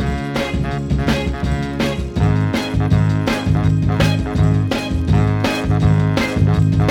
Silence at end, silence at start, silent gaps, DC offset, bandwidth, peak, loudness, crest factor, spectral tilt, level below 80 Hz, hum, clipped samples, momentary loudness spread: 0 s; 0 s; none; under 0.1%; 14.5 kHz; -2 dBFS; -17 LUFS; 14 dB; -7 dB/octave; -26 dBFS; none; under 0.1%; 5 LU